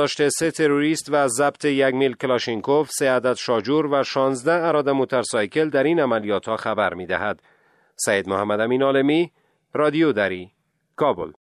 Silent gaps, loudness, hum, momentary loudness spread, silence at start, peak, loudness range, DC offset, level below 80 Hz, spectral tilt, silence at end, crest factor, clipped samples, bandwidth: none; -21 LUFS; none; 6 LU; 0 s; -4 dBFS; 2 LU; under 0.1%; -64 dBFS; -4.5 dB/octave; 0.15 s; 16 dB; under 0.1%; 13.5 kHz